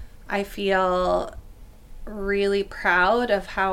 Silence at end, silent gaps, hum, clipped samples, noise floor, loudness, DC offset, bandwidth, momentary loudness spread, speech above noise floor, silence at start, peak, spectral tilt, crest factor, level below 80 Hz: 0 s; none; none; under 0.1%; -44 dBFS; -23 LUFS; under 0.1%; 16 kHz; 11 LU; 21 dB; 0 s; -6 dBFS; -5 dB/octave; 18 dB; -42 dBFS